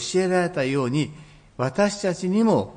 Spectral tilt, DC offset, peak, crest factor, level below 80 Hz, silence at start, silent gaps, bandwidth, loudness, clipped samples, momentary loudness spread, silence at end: -5.5 dB/octave; under 0.1%; -8 dBFS; 16 dB; -56 dBFS; 0 s; none; 10.5 kHz; -23 LUFS; under 0.1%; 7 LU; 0 s